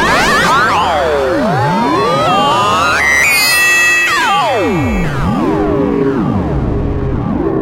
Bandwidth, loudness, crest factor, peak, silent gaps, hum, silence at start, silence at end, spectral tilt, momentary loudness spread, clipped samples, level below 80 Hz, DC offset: 16 kHz; -11 LUFS; 12 dB; 0 dBFS; none; none; 0 s; 0 s; -4 dB/octave; 8 LU; under 0.1%; -26 dBFS; under 0.1%